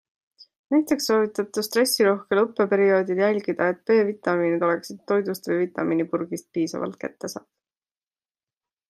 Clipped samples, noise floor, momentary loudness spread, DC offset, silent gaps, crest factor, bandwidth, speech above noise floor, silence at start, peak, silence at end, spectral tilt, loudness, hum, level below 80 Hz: under 0.1%; under -90 dBFS; 10 LU; under 0.1%; none; 16 dB; 15 kHz; over 67 dB; 0.7 s; -8 dBFS; 1.5 s; -4.5 dB/octave; -23 LUFS; none; -74 dBFS